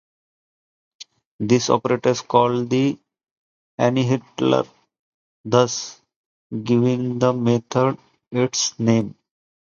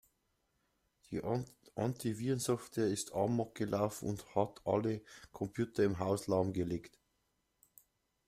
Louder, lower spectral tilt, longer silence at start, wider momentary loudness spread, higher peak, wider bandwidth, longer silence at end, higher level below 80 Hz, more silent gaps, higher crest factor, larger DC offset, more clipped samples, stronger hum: first, -20 LUFS vs -37 LUFS; about the same, -5.5 dB/octave vs -6 dB/octave; about the same, 1 s vs 1.1 s; first, 15 LU vs 9 LU; first, 0 dBFS vs -16 dBFS; second, 7.4 kHz vs 16 kHz; second, 0.6 s vs 1.4 s; about the same, -62 dBFS vs -66 dBFS; first, 1.25-1.39 s, 3.31-3.78 s, 4.99-5.44 s, 6.16-6.50 s vs none; about the same, 20 dB vs 20 dB; neither; neither; neither